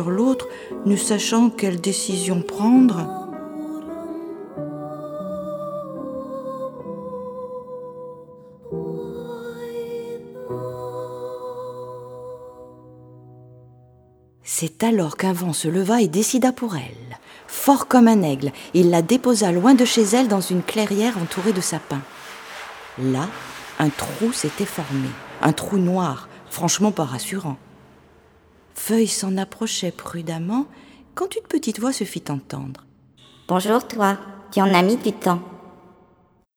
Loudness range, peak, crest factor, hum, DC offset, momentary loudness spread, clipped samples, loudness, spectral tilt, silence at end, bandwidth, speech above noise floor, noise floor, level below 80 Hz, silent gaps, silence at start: 15 LU; -2 dBFS; 20 dB; none; under 0.1%; 18 LU; under 0.1%; -21 LUFS; -5 dB/octave; 0.85 s; over 20 kHz; 38 dB; -58 dBFS; -60 dBFS; none; 0 s